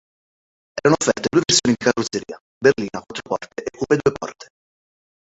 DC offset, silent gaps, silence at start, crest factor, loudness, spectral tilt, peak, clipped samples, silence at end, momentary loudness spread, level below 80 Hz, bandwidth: under 0.1%; 2.40-2.61 s; 0.75 s; 20 dB; -19 LUFS; -3.5 dB/octave; -2 dBFS; under 0.1%; 0.9 s; 16 LU; -54 dBFS; 8.2 kHz